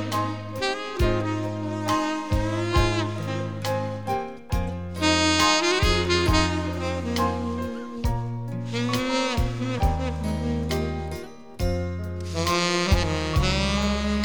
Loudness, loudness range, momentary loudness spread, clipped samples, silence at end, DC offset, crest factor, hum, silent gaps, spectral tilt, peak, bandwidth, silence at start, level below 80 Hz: -25 LUFS; 5 LU; 10 LU; under 0.1%; 0 s; 0.6%; 18 dB; none; none; -4.5 dB/octave; -6 dBFS; over 20 kHz; 0 s; -32 dBFS